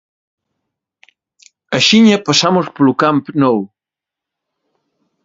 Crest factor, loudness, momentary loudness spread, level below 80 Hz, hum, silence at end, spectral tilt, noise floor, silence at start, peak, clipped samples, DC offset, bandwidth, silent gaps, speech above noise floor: 16 dB; -12 LUFS; 10 LU; -58 dBFS; none; 1.6 s; -4.5 dB/octave; -86 dBFS; 1.7 s; 0 dBFS; under 0.1%; under 0.1%; 7.8 kHz; none; 74 dB